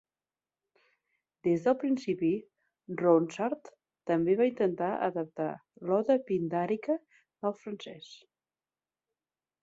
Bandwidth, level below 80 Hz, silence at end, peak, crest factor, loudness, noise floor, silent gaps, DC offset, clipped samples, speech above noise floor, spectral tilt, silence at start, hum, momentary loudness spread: 7.8 kHz; -76 dBFS; 1.45 s; -12 dBFS; 20 dB; -30 LUFS; under -90 dBFS; none; under 0.1%; under 0.1%; over 60 dB; -7.5 dB/octave; 1.45 s; none; 15 LU